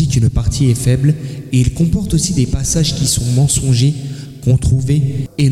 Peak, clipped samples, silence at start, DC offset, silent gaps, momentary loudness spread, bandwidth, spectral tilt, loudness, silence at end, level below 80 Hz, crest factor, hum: -2 dBFS; under 0.1%; 0 s; under 0.1%; none; 5 LU; 14.5 kHz; -5.5 dB/octave; -15 LUFS; 0 s; -28 dBFS; 10 dB; none